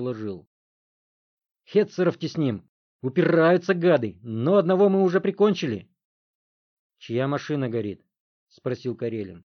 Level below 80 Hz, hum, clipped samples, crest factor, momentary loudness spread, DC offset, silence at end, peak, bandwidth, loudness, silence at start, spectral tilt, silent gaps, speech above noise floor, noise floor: -72 dBFS; none; under 0.1%; 18 dB; 15 LU; under 0.1%; 0.05 s; -8 dBFS; 6.6 kHz; -23 LUFS; 0 s; -7.5 dB/octave; 0.47-1.37 s, 1.51-1.55 s, 2.69-2.99 s, 6.05-6.90 s, 8.20-8.47 s; over 67 dB; under -90 dBFS